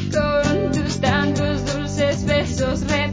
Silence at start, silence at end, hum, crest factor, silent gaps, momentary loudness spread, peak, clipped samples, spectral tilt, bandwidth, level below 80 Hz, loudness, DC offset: 0 s; 0 s; none; 14 dB; none; 3 LU; -6 dBFS; under 0.1%; -5.5 dB/octave; 7.8 kHz; -32 dBFS; -20 LUFS; under 0.1%